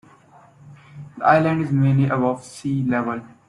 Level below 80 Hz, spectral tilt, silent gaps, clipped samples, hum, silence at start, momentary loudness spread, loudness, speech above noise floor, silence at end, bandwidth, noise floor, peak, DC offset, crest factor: -58 dBFS; -8 dB/octave; none; under 0.1%; none; 0.65 s; 11 LU; -20 LUFS; 31 dB; 0.2 s; 11 kHz; -50 dBFS; -2 dBFS; under 0.1%; 20 dB